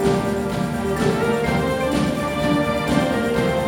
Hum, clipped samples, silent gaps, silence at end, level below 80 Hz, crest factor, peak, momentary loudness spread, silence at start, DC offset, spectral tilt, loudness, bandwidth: none; under 0.1%; none; 0 s; -38 dBFS; 14 dB; -6 dBFS; 3 LU; 0 s; under 0.1%; -6 dB/octave; -21 LUFS; 18 kHz